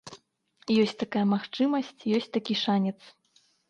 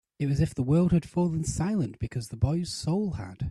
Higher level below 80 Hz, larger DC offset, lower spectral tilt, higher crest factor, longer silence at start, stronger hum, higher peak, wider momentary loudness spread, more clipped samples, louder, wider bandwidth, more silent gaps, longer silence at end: second, -72 dBFS vs -46 dBFS; neither; about the same, -6.5 dB/octave vs -7 dB/octave; about the same, 16 dB vs 16 dB; second, 0.05 s vs 0.2 s; neither; about the same, -12 dBFS vs -12 dBFS; about the same, 11 LU vs 9 LU; neither; about the same, -27 LUFS vs -28 LUFS; second, 9 kHz vs 12 kHz; neither; first, 0.75 s vs 0 s